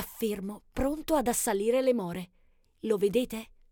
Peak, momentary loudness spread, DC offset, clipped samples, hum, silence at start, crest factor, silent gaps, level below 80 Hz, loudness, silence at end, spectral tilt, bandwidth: -14 dBFS; 13 LU; under 0.1%; under 0.1%; none; 0 s; 16 dB; none; -50 dBFS; -29 LUFS; 0.25 s; -4.5 dB/octave; 19 kHz